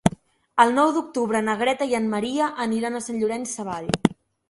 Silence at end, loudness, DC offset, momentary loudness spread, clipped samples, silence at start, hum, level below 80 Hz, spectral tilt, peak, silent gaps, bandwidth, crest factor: 0.35 s; -23 LUFS; under 0.1%; 9 LU; under 0.1%; 0.05 s; none; -54 dBFS; -5 dB/octave; 0 dBFS; none; 11.5 kHz; 24 dB